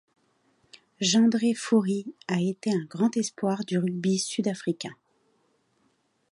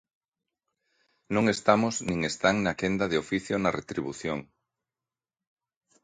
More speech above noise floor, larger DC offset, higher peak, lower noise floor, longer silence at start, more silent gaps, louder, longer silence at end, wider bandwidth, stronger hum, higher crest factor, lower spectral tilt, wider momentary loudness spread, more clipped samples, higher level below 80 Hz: second, 44 dB vs over 63 dB; neither; second, -10 dBFS vs -6 dBFS; second, -70 dBFS vs under -90 dBFS; second, 1 s vs 1.3 s; neither; about the same, -26 LUFS vs -27 LUFS; second, 1.4 s vs 1.6 s; about the same, 11.5 kHz vs 10.5 kHz; neither; second, 18 dB vs 24 dB; about the same, -5 dB/octave vs -5 dB/octave; about the same, 10 LU vs 10 LU; neither; second, -76 dBFS vs -58 dBFS